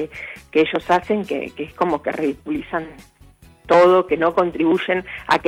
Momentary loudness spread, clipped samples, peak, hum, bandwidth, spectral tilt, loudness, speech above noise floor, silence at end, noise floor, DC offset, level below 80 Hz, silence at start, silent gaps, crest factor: 13 LU; under 0.1%; -4 dBFS; none; 12.5 kHz; -6 dB/octave; -19 LUFS; 29 dB; 0 s; -48 dBFS; under 0.1%; -52 dBFS; 0 s; none; 16 dB